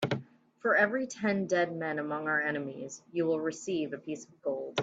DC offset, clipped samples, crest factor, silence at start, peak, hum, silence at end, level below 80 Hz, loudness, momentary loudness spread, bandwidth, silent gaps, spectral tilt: under 0.1%; under 0.1%; 20 dB; 0 s; -12 dBFS; none; 0 s; -76 dBFS; -32 LUFS; 11 LU; 9 kHz; none; -5 dB/octave